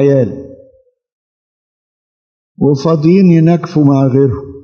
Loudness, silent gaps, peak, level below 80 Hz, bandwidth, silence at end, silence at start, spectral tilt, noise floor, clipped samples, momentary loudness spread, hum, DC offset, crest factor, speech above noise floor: -10 LUFS; 1.13-2.55 s; 0 dBFS; -50 dBFS; 6.8 kHz; 0.05 s; 0 s; -9.5 dB/octave; -48 dBFS; under 0.1%; 8 LU; none; under 0.1%; 12 dB; 39 dB